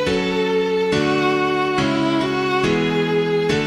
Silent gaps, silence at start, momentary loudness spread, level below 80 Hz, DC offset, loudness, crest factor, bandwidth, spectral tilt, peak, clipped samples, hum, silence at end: none; 0 s; 1 LU; -46 dBFS; under 0.1%; -19 LUFS; 12 dB; 13 kHz; -5.5 dB/octave; -6 dBFS; under 0.1%; none; 0 s